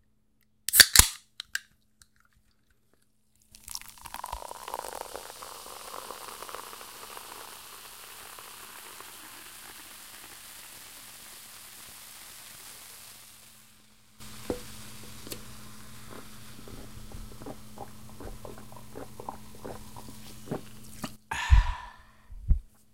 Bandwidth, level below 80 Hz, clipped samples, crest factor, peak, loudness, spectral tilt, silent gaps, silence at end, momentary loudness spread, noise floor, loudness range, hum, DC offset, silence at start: 16.5 kHz; -38 dBFS; under 0.1%; 34 dB; 0 dBFS; -27 LUFS; -1.5 dB/octave; none; 0.1 s; 17 LU; -71 dBFS; 13 LU; none; under 0.1%; 0 s